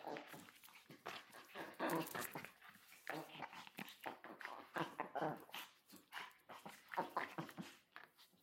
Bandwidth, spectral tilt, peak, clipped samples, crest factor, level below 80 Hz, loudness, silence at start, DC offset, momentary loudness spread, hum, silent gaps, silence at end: 16.5 kHz; -4 dB/octave; -28 dBFS; under 0.1%; 22 dB; under -90 dBFS; -50 LUFS; 0 s; under 0.1%; 16 LU; none; none; 0.15 s